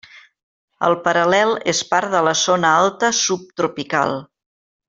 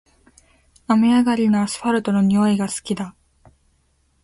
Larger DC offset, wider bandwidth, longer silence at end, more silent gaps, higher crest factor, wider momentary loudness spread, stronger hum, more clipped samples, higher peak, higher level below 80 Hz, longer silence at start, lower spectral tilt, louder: neither; second, 8 kHz vs 11.5 kHz; second, 0.65 s vs 1.15 s; first, 0.43-0.68 s vs none; about the same, 16 dB vs 14 dB; second, 7 LU vs 11 LU; neither; neither; first, -2 dBFS vs -6 dBFS; second, -62 dBFS vs -56 dBFS; second, 0.15 s vs 0.9 s; second, -2.5 dB/octave vs -6 dB/octave; about the same, -17 LUFS vs -19 LUFS